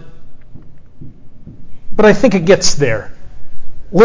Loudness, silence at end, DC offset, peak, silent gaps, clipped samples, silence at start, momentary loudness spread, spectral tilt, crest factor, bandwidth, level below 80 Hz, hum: -12 LUFS; 0 s; under 0.1%; 0 dBFS; none; under 0.1%; 0 s; 14 LU; -4.5 dB/octave; 12 dB; 7.6 kHz; -34 dBFS; none